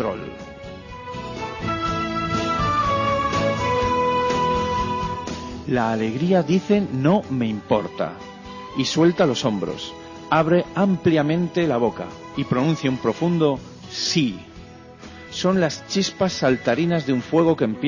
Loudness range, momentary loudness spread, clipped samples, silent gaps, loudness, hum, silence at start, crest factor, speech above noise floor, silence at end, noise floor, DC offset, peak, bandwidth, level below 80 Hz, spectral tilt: 3 LU; 15 LU; under 0.1%; none; -21 LUFS; none; 0 s; 16 dB; 21 dB; 0 s; -42 dBFS; under 0.1%; -6 dBFS; 7.4 kHz; -44 dBFS; -6 dB/octave